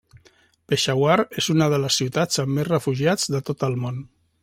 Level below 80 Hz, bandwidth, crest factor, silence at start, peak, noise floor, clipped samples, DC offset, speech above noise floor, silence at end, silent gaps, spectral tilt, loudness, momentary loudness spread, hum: -60 dBFS; 16 kHz; 18 dB; 0.7 s; -4 dBFS; -58 dBFS; under 0.1%; under 0.1%; 36 dB; 0.35 s; none; -4.5 dB/octave; -22 LUFS; 6 LU; none